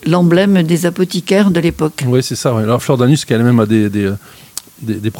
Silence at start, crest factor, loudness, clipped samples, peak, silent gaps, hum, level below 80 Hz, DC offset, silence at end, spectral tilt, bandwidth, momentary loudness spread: 0 s; 12 dB; -13 LUFS; under 0.1%; 0 dBFS; none; none; -44 dBFS; under 0.1%; 0 s; -6 dB/octave; 17 kHz; 13 LU